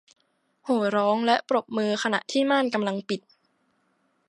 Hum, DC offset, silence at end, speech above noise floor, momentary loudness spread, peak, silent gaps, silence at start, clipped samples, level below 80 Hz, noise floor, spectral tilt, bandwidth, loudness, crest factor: none; under 0.1%; 1.1 s; 46 dB; 9 LU; -8 dBFS; none; 0.65 s; under 0.1%; -78 dBFS; -70 dBFS; -4.5 dB/octave; 11 kHz; -25 LUFS; 18 dB